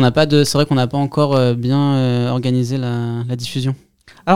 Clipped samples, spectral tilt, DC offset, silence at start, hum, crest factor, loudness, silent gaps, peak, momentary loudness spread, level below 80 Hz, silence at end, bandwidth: under 0.1%; -6.5 dB/octave; 1%; 0 s; none; 16 dB; -17 LUFS; none; 0 dBFS; 9 LU; -50 dBFS; 0 s; 15 kHz